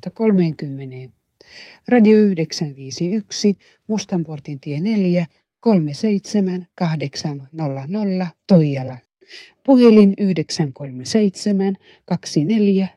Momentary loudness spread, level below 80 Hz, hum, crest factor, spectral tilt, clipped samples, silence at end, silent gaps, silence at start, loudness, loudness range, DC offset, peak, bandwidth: 16 LU; -64 dBFS; none; 16 dB; -7 dB/octave; under 0.1%; 0.1 s; none; 0.05 s; -18 LUFS; 5 LU; under 0.1%; -2 dBFS; 11 kHz